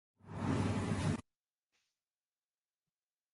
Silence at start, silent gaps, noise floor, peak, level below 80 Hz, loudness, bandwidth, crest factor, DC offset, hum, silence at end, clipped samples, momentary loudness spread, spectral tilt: 0.25 s; none; under -90 dBFS; -22 dBFS; -56 dBFS; -38 LUFS; 11.5 kHz; 20 dB; under 0.1%; none; 2.1 s; under 0.1%; 8 LU; -6.5 dB/octave